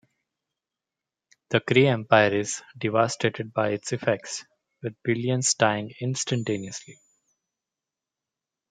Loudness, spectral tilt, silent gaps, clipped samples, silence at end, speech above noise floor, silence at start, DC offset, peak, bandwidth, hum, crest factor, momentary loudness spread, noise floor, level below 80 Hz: -24 LUFS; -4 dB/octave; none; under 0.1%; 1.8 s; 64 dB; 1.5 s; under 0.1%; -4 dBFS; 9.6 kHz; none; 24 dB; 14 LU; -88 dBFS; -70 dBFS